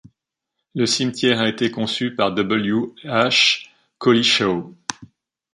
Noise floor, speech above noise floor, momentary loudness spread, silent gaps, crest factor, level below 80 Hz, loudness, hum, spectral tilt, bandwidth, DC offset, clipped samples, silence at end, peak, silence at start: -80 dBFS; 61 dB; 11 LU; none; 18 dB; -60 dBFS; -19 LUFS; none; -3.5 dB/octave; 11.5 kHz; under 0.1%; under 0.1%; 0.5 s; -2 dBFS; 0.75 s